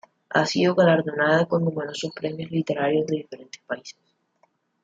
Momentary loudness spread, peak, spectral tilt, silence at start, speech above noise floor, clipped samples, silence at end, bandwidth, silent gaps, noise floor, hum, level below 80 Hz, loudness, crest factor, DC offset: 15 LU; -6 dBFS; -6 dB/octave; 0.3 s; 44 dB; under 0.1%; 0.9 s; 8 kHz; none; -67 dBFS; none; -68 dBFS; -23 LUFS; 18 dB; under 0.1%